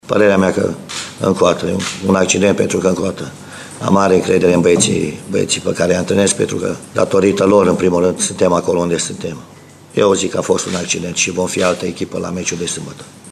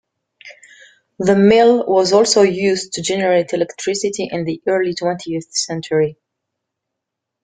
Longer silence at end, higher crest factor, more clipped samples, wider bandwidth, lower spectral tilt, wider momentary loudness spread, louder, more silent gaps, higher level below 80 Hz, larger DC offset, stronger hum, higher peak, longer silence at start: second, 0 s vs 1.3 s; about the same, 16 dB vs 16 dB; neither; first, 13.5 kHz vs 9.6 kHz; about the same, -4.5 dB/octave vs -4 dB/octave; about the same, 11 LU vs 10 LU; about the same, -15 LUFS vs -16 LUFS; neither; first, -50 dBFS vs -56 dBFS; neither; neither; about the same, 0 dBFS vs -2 dBFS; second, 0.05 s vs 0.45 s